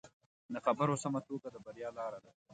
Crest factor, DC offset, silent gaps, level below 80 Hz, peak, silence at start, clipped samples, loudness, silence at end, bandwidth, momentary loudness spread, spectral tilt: 20 dB; under 0.1%; 0.13-0.20 s, 0.26-0.49 s, 2.34-2.46 s; -78 dBFS; -18 dBFS; 0.05 s; under 0.1%; -38 LUFS; 0 s; 9 kHz; 13 LU; -6 dB/octave